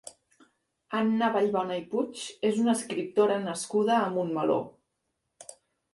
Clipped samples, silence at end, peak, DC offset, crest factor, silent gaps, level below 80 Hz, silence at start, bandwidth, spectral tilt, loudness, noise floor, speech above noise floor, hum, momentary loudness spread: under 0.1%; 0.4 s; -12 dBFS; under 0.1%; 18 dB; none; -74 dBFS; 0.05 s; 11.5 kHz; -5 dB/octave; -28 LUFS; -80 dBFS; 53 dB; none; 21 LU